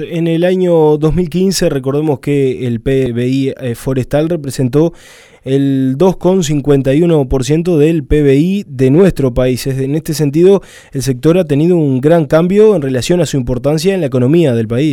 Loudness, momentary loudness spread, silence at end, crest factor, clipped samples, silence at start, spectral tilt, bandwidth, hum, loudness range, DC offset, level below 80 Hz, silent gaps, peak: -12 LUFS; 7 LU; 0 s; 12 dB; under 0.1%; 0 s; -7 dB/octave; 17 kHz; none; 4 LU; under 0.1%; -30 dBFS; none; 0 dBFS